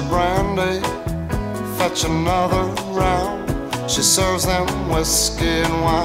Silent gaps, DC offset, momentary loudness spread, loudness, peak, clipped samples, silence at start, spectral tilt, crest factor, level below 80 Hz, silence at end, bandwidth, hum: none; under 0.1%; 9 LU; -19 LUFS; -4 dBFS; under 0.1%; 0 s; -3.5 dB/octave; 16 dB; -30 dBFS; 0 s; 16.5 kHz; none